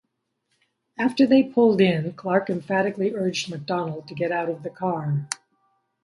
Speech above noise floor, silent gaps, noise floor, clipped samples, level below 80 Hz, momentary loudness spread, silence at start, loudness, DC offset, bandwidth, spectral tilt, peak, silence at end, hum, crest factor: 54 dB; none; -76 dBFS; under 0.1%; -68 dBFS; 11 LU; 1 s; -23 LUFS; under 0.1%; 11.5 kHz; -6 dB/octave; -6 dBFS; 0.7 s; none; 18 dB